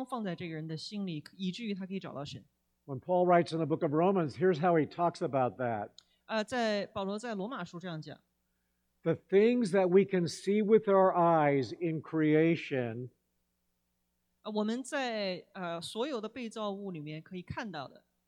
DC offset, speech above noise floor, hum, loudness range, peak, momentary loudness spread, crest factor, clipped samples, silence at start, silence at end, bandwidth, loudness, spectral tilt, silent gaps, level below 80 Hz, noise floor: under 0.1%; 49 dB; none; 10 LU; -12 dBFS; 16 LU; 20 dB; under 0.1%; 0 s; 0.4 s; 12 kHz; -31 LUFS; -6.5 dB/octave; none; -74 dBFS; -80 dBFS